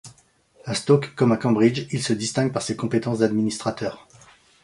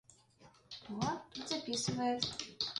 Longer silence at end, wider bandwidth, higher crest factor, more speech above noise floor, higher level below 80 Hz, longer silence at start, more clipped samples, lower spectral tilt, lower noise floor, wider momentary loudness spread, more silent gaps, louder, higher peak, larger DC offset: first, 0.65 s vs 0 s; about the same, 11.5 kHz vs 11.5 kHz; about the same, 18 dB vs 22 dB; first, 35 dB vs 26 dB; first, -60 dBFS vs -68 dBFS; about the same, 0.05 s vs 0.1 s; neither; first, -5.5 dB/octave vs -3.5 dB/octave; second, -57 dBFS vs -64 dBFS; second, 9 LU vs 12 LU; neither; first, -22 LUFS vs -38 LUFS; first, -4 dBFS vs -18 dBFS; neither